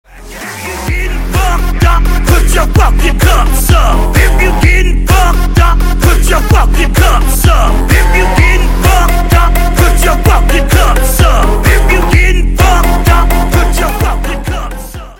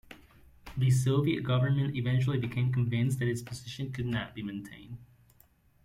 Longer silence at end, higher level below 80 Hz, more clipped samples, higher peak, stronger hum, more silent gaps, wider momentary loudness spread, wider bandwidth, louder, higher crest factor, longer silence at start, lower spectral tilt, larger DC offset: second, 0.05 s vs 0.8 s; first, -8 dBFS vs -58 dBFS; first, 0.3% vs under 0.1%; first, 0 dBFS vs -16 dBFS; neither; neither; second, 7 LU vs 15 LU; first, 17 kHz vs 13.5 kHz; first, -10 LUFS vs -30 LUFS; second, 8 dB vs 16 dB; about the same, 0.15 s vs 0.1 s; second, -5 dB/octave vs -7 dB/octave; neither